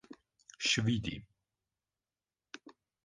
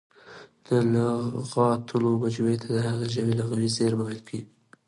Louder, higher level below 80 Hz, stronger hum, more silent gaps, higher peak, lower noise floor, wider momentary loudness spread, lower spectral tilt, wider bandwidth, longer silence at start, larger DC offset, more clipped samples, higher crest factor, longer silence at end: second, -33 LUFS vs -26 LUFS; about the same, -62 dBFS vs -62 dBFS; neither; neither; second, -16 dBFS vs -10 dBFS; first, under -90 dBFS vs -49 dBFS; first, 23 LU vs 7 LU; second, -3.5 dB/octave vs -6.5 dB/octave; second, 9.8 kHz vs 11 kHz; second, 0.1 s vs 0.25 s; neither; neither; first, 22 dB vs 16 dB; about the same, 0.35 s vs 0.45 s